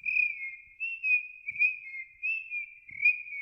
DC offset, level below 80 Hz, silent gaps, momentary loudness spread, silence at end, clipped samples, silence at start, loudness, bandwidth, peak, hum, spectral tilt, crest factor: under 0.1%; -76 dBFS; none; 13 LU; 0 s; under 0.1%; 0.05 s; -29 LUFS; 5.6 kHz; -16 dBFS; none; -1.5 dB/octave; 16 dB